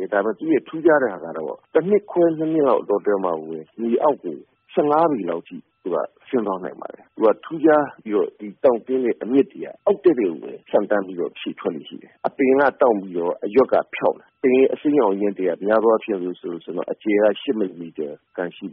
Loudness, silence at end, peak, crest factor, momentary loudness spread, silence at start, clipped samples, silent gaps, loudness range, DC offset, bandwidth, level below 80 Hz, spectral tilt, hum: -21 LUFS; 0 s; -4 dBFS; 16 dB; 12 LU; 0 s; under 0.1%; none; 3 LU; under 0.1%; 4 kHz; -66 dBFS; -5 dB/octave; none